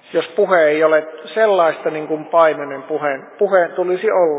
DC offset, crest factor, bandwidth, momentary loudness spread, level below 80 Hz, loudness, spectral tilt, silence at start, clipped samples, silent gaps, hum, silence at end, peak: under 0.1%; 14 dB; 4 kHz; 10 LU; -80 dBFS; -16 LUFS; -8.5 dB/octave; 0.1 s; under 0.1%; none; none; 0 s; -2 dBFS